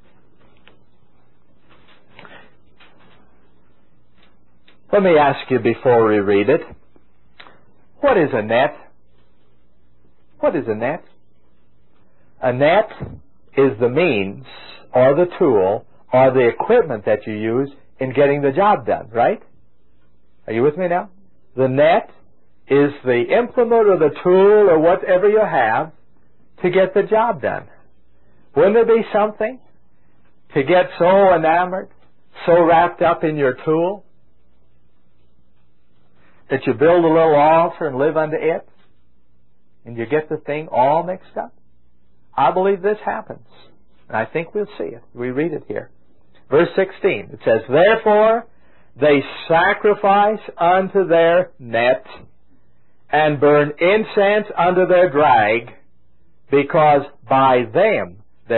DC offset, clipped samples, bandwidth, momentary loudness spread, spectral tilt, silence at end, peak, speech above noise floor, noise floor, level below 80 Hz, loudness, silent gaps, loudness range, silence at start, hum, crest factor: 0.8%; under 0.1%; 4.2 kHz; 12 LU; -11.5 dB/octave; 0 s; -2 dBFS; 47 dB; -62 dBFS; -56 dBFS; -16 LUFS; none; 7 LU; 4.9 s; none; 16 dB